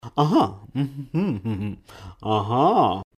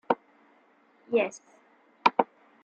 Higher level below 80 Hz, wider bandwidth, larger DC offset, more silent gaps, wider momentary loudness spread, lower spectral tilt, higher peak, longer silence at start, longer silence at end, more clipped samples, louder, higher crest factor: first, -54 dBFS vs -80 dBFS; first, 13.5 kHz vs 8.8 kHz; neither; neither; first, 13 LU vs 10 LU; first, -8 dB/octave vs -4 dB/octave; about the same, -6 dBFS vs -4 dBFS; about the same, 0.05 s vs 0.1 s; second, 0.15 s vs 0.4 s; neither; first, -23 LUFS vs -28 LUFS; second, 18 dB vs 28 dB